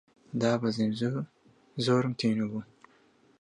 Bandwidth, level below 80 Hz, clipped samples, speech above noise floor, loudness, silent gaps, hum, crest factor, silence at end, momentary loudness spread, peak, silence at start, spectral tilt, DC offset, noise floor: 10.5 kHz; -70 dBFS; under 0.1%; 35 dB; -30 LUFS; none; none; 20 dB; 0.75 s; 13 LU; -12 dBFS; 0.35 s; -6.5 dB/octave; under 0.1%; -63 dBFS